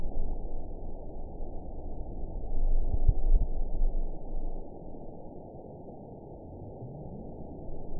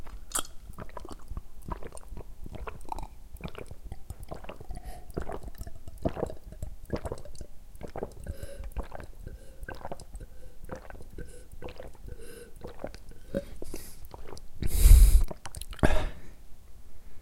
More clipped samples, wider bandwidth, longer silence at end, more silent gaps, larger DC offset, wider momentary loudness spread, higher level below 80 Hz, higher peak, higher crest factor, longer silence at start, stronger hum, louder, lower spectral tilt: neither; second, 1 kHz vs 16.5 kHz; about the same, 0 s vs 0 s; neither; neither; second, 14 LU vs 19 LU; about the same, -30 dBFS vs -30 dBFS; second, -10 dBFS vs -4 dBFS; second, 18 dB vs 24 dB; about the same, 0 s vs 0 s; neither; second, -39 LUFS vs -33 LUFS; first, -16 dB/octave vs -5 dB/octave